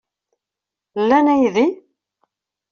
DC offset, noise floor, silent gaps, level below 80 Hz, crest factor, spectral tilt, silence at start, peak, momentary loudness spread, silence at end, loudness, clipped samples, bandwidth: under 0.1%; -86 dBFS; none; -62 dBFS; 18 dB; -4 dB/octave; 0.95 s; -2 dBFS; 16 LU; 0.95 s; -16 LUFS; under 0.1%; 7 kHz